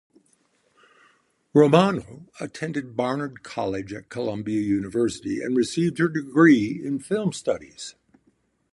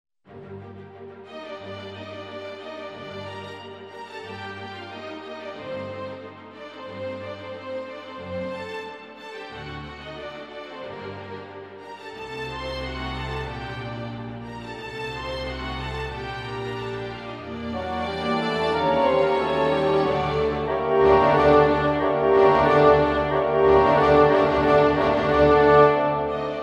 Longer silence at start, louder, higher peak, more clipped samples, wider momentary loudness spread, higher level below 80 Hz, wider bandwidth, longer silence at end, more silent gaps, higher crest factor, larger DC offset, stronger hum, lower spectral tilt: first, 1.55 s vs 0.3 s; about the same, -23 LUFS vs -21 LUFS; about the same, -2 dBFS vs -4 dBFS; neither; second, 16 LU vs 21 LU; second, -60 dBFS vs -44 dBFS; first, 11.5 kHz vs 9.4 kHz; first, 0.85 s vs 0 s; neither; about the same, 22 dB vs 20 dB; neither; neither; about the same, -6 dB/octave vs -7 dB/octave